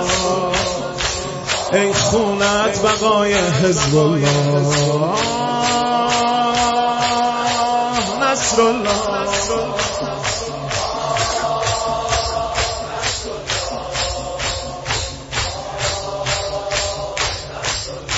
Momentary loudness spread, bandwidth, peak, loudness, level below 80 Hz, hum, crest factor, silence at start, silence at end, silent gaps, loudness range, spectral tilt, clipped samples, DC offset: 7 LU; 8.2 kHz; -2 dBFS; -18 LUFS; -38 dBFS; none; 16 dB; 0 s; 0 s; none; 6 LU; -3.5 dB/octave; under 0.1%; under 0.1%